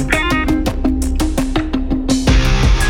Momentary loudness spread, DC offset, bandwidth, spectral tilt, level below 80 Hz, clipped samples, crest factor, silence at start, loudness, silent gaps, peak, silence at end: 5 LU; under 0.1%; 17 kHz; -5 dB/octave; -18 dBFS; under 0.1%; 12 dB; 0 s; -16 LUFS; none; -2 dBFS; 0 s